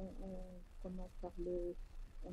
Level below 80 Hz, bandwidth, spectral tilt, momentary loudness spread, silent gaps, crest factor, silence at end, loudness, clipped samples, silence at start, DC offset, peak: -50 dBFS; 11 kHz; -8.5 dB/octave; 12 LU; none; 14 dB; 0 s; -49 LUFS; under 0.1%; 0 s; under 0.1%; -32 dBFS